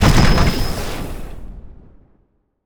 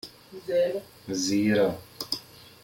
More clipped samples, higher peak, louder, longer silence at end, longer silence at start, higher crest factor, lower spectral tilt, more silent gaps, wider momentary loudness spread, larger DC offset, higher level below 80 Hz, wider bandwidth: neither; first, 0 dBFS vs -12 dBFS; first, -18 LUFS vs -27 LUFS; first, 0.95 s vs 0.4 s; about the same, 0 s vs 0.05 s; about the same, 16 dB vs 16 dB; about the same, -5.5 dB/octave vs -4.5 dB/octave; neither; first, 25 LU vs 13 LU; neither; first, -22 dBFS vs -64 dBFS; first, over 20 kHz vs 17 kHz